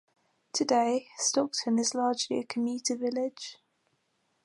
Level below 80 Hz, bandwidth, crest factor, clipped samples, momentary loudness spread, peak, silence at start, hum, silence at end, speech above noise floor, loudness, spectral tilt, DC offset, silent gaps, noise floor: -82 dBFS; 11.5 kHz; 18 dB; under 0.1%; 9 LU; -12 dBFS; 0.55 s; none; 0.9 s; 46 dB; -29 LUFS; -2.5 dB/octave; under 0.1%; none; -75 dBFS